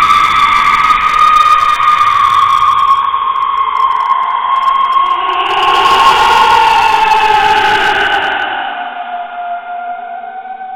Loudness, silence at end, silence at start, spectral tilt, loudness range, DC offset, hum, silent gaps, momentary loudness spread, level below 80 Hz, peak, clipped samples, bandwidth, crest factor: -9 LUFS; 0 s; 0 s; -1.5 dB/octave; 4 LU; under 0.1%; none; none; 14 LU; -40 dBFS; 0 dBFS; 0.2%; 17 kHz; 10 dB